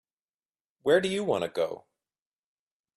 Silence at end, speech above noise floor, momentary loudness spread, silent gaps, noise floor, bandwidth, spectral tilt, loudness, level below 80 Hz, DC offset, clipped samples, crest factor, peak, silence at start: 1.2 s; over 63 dB; 9 LU; none; under -90 dBFS; 13.5 kHz; -5 dB/octave; -28 LUFS; -72 dBFS; under 0.1%; under 0.1%; 20 dB; -10 dBFS; 0.85 s